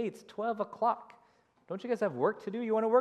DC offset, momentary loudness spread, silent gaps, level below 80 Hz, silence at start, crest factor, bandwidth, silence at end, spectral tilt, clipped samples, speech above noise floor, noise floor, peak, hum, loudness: under 0.1%; 9 LU; none; -88 dBFS; 0 s; 20 dB; 12 kHz; 0 s; -7 dB/octave; under 0.1%; 35 dB; -67 dBFS; -14 dBFS; none; -33 LUFS